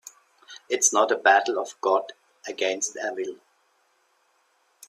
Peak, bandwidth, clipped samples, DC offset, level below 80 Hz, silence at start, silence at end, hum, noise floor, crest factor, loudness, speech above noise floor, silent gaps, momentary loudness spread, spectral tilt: -4 dBFS; 15.5 kHz; under 0.1%; under 0.1%; -80 dBFS; 0.5 s; 1.55 s; none; -67 dBFS; 22 dB; -23 LUFS; 43 dB; none; 16 LU; 0 dB/octave